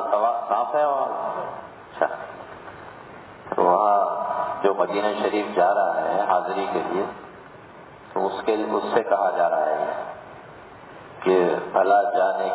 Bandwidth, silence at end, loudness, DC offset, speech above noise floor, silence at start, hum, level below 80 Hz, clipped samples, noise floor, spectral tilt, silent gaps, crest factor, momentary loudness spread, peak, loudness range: 4 kHz; 0 s; -23 LUFS; under 0.1%; 23 dB; 0 s; none; -64 dBFS; under 0.1%; -44 dBFS; -9 dB/octave; none; 18 dB; 22 LU; -6 dBFS; 4 LU